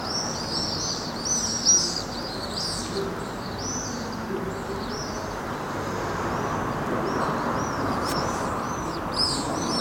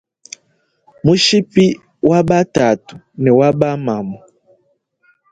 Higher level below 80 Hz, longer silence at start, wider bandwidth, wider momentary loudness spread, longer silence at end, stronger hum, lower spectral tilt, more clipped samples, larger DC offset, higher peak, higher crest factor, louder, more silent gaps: about the same, -46 dBFS vs -50 dBFS; second, 0 s vs 1.05 s; first, 16.5 kHz vs 9.2 kHz; second, 8 LU vs 23 LU; second, 0 s vs 1.15 s; neither; second, -2.5 dB/octave vs -5.5 dB/octave; neither; neither; second, -8 dBFS vs 0 dBFS; about the same, 18 dB vs 16 dB; second, -26 LUFS vs -14 LUFS; neither